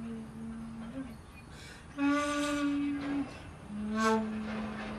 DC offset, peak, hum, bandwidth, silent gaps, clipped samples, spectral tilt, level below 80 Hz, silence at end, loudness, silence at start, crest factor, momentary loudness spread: under 0.1%; -16 dBFS; none; 13 kHz; none; under 0.1%; -5 dB/octave; -56 dBFS; 0 s; -34 LUFS; 0 s; 18 dB; 18 LU